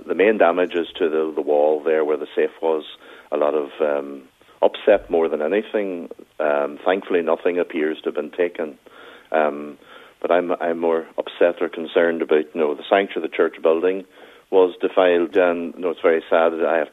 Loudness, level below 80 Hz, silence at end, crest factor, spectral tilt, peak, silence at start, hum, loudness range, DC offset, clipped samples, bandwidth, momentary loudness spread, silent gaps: -20 LUFS; -62 dBFS; 0.05 s; 18 dB; -6.5 dB/octave; -2 dBFS; 0 s; none; 4 LU; under 0.1%; under 0.1%; 4 kHz; 9 LU; none